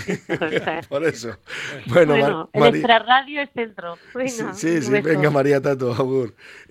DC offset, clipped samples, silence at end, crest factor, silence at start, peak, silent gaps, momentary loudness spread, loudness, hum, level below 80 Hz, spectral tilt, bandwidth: under 0.1%; under 0.1%; 0.1 s; 20 dB; 0 s; 0 dBFS; none; 14 LU; -20 LUFS; none; -58 dBFS; -5.5 dB/octave; 15 kHz